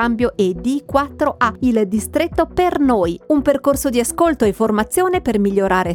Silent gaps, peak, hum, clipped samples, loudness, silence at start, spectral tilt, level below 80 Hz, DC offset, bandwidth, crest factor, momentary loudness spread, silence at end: none; -2 dBFS; none; under 0.1%; -17 LUFS; 0 s; -5 dB/octave; -38 dBFS; under 0.1%; 18.5 kHz; 16 dB; 3 LU; 0 s